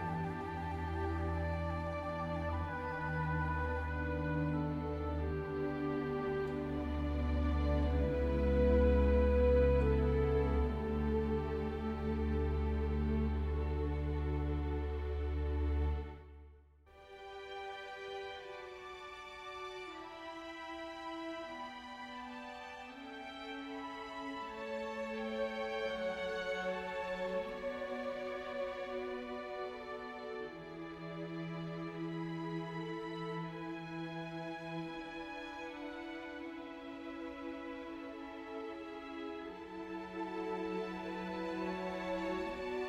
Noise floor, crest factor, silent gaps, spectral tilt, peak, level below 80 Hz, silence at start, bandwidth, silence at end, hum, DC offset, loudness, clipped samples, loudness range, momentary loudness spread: -61 dBFS; 18 dB; none; -8 dB/octave; -20 dBFS; -42 dBFS; 0 s; 7.4 kHz; 0 s; none; under 0.1%; -39 LUFS; under 0.1%; 13 LU; 13 LU